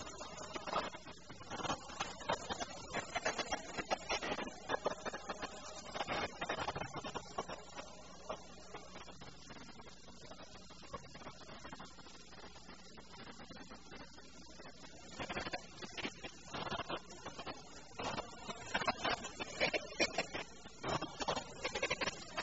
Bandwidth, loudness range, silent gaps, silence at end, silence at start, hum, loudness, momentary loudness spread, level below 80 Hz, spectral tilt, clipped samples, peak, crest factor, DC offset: 8 kHz; 14 LU; none; 0 s; 0 s; none; -42 LUFS; 17 LU; -64 dBFS; -1.5 dB/octave; under 0.1%; -20 dBFS; 24 dB; 0.1%